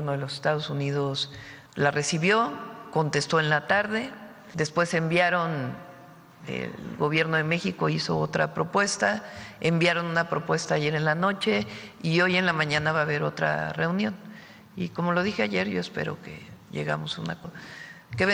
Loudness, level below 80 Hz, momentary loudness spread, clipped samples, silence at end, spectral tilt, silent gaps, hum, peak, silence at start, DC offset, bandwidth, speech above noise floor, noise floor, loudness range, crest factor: -26 LUFS; -62 dBFS; 16 LU; under 0.1%; 0 s; -5 dB/octave; none; none; -8 dBFS; 0 s; under 0.1%; 12 kHz; 23 dB; -49 dBFS; 4 LU; 20 dB